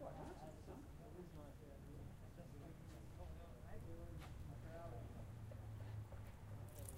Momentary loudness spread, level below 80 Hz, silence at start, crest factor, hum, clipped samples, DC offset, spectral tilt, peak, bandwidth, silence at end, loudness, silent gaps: 4 LU; -60 dBFS; 0 s; 20 dB; none; under 0.1%; under 0.1%; -6.5 dB/octave; -34 dBFS; 16 kHz; 0 s; -56 LUFS; none